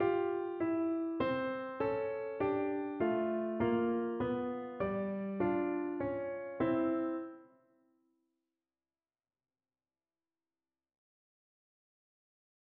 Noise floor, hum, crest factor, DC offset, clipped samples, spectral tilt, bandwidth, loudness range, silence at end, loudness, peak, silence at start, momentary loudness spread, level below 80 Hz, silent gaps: under -90 dBFS; none; 16 dB; under 0.1%; under 0.1%; -6.5 dB/octave; 4.5 kHz; 5 LU; 5.25 s; -36 LUFS; -20 dBFS; 0 s; 6 LU; -68 dBFS; none